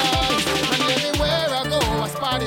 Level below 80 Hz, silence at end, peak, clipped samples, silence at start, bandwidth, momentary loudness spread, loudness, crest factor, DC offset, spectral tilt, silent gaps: -34 dBFS; 0 s; -6 dBFS; under 0.1%; 0 s; 17.5 kHz; 4 LU; -20 LUFS; 14 dB; under 0.1%; -3.5 dB/octave; none